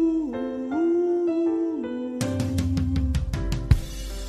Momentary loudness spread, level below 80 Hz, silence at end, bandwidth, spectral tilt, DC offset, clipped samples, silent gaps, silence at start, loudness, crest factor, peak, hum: 7 LU; -32 dBFS; 0 s; 14 kHz; -7.5 dB/octave; under 0.1%; under 0.1%; none; 0 s; -26 LUFS; 20 dB; -4 dBFS; none